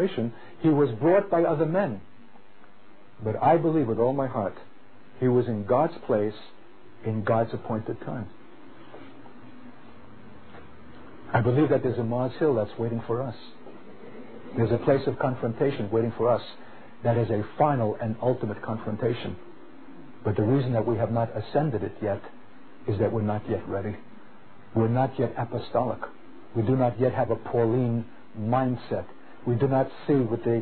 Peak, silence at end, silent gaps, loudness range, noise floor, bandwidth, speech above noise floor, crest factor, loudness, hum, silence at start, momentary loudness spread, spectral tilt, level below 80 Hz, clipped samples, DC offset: -8 dBFS; 0 s; none; 5 LU; -55 dBFS; 4.5 kHz; 30 dB; 18 dB; -26 LUFS; none; 0 s; 18 LU; -12 dB/octave; -56 dBFS; under 0.1%; 0.8%